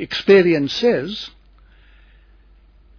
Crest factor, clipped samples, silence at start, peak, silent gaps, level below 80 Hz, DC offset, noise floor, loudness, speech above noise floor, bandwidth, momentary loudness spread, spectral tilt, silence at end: 18 dB; under 0.1%; 0 s; -2 dBFS; none; -50 dBFS; under 0.1%; -50 dBFS; -16 LUFS; 33 dB; 5.4 kHz; 17 LU; -6 dB/octave; 1.7 s